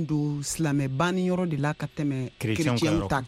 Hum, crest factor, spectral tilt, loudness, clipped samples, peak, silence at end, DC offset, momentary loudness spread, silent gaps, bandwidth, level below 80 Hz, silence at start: none; 14 dB; -5.5 dB/octave; -27 LUFS; under 0.1%; -12 dBFS; 0 s; under 0.1%; 5 LU; none; 16 kHz; -48 dBFS; 0 s